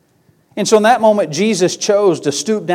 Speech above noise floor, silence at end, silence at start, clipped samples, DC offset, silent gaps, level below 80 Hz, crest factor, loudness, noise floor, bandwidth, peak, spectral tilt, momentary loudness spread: 42 dB; 0 s; 0.55 s; under 0.1%; under 0.1%; none; -64 dBFS; 14 dB; -14 LUFS; -55 dBFS; 15.5 kHz; 0 dBFS; -4 dB/octave; 7 LU